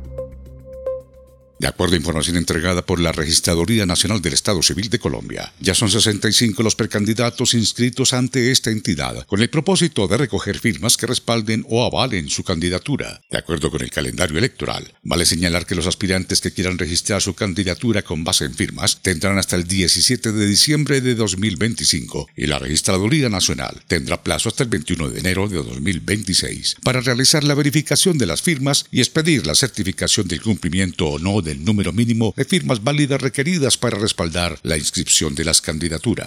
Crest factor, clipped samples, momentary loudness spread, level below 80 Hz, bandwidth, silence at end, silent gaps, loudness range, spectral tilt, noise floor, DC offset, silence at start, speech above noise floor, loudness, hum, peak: 18 dB; under 0.1%; 8 LU; -42 dBFS; 17.5 kHz; 0 s; none; 4 LU; -3.5 dB/octave; -47 dBFS; under 0.1%; 0 s; 28 dB; -18 LUFS; none; 0 dBFS